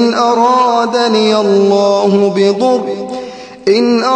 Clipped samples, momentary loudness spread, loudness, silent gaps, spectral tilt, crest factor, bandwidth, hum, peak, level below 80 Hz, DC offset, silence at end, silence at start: under 0.1%; 11 LU; -11 LUFS; none; -5 dB/octave; 10 dB; 9.2 kHz; none; 0 dBFS; -58 dBFS; under 0.1%; 0 s; 0 s